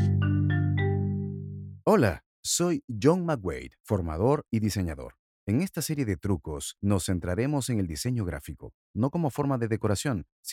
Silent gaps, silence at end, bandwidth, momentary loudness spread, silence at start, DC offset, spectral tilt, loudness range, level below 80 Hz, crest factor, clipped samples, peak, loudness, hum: 2.26-2.43 s, 2.84-2.88 s, 3.80-3.84 s, 5.19-5.47 s, 8.74-8.94 s, 10.32-10.43 s; 0 s; 16 kHz; 11 LU; 0 s; under 0.1%; -6 dB/octave; 3 LU; -48 dBFS; 20 dB; under 0.1%; -8 dBFS; -28 LUFS; 50 Hz at -50 dBFS